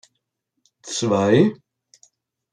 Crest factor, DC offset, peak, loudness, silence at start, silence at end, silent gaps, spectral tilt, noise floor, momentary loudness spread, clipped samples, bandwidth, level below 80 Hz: 20 dB; under 0.1%; -2 dBFS; -19 LUFS; 0.85 s; 1 s; none; -5.5 dB/octave; -76 dBFS; 14 LU; under 0.1%; 11 kHz; -66 dBFS